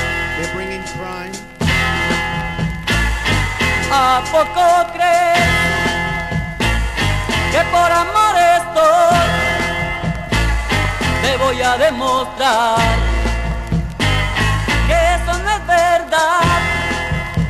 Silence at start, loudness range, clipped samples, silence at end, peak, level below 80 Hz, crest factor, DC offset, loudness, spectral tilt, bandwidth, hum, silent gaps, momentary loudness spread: 0 s; 3 LU; under 0.1%; 0 s; -4 dBFS; -24 dBFS; 12 dB; under 0.1%; -15 LUFS; -4.5 dB/octave; 13 kHz; none; none; 8 LU